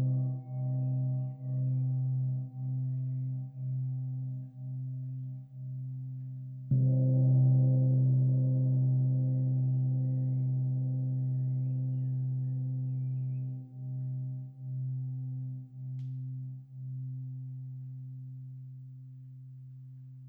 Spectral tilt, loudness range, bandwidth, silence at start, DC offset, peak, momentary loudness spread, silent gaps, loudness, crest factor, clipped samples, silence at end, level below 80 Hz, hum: -14.5 dB/octave; 14 LU; 0.8 kHz; 0 s; under 0.1%; -18 dBFS; 17 LU; none; -32 LUFS; 14 dB; under 0.1%; 0 s; -76 dBFS; none